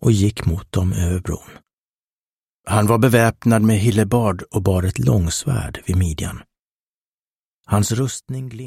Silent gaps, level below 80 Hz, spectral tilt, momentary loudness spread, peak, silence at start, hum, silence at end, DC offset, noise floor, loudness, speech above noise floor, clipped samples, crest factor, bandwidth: 1.73-2.64 s, 6.59-7.61 s; -36 dBFS; -6 dB/octave; 13 LU; -2 dBFS; 0 s; none; 0 s; under 0.1%; under -90 dBFS; -19 LUFS; over 72 dB; under 0.1%; 18 dB; 16 kHz